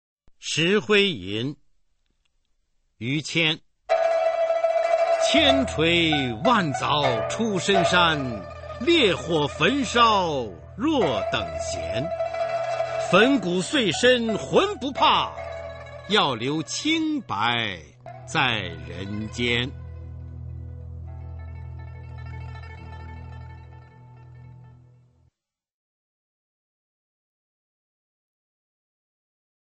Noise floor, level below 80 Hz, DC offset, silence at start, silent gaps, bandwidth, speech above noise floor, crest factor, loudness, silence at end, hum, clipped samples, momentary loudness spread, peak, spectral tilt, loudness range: -71 dBFS; -48 dBFS; under 0.1%; 0.4 s; none; 8.8 kHz; 49 dB; 20 dB; -22 LUFS; 4.95 s; none; under 0.1%; 20 LU; -4 dBFS; -4 dB/octave; 18 LU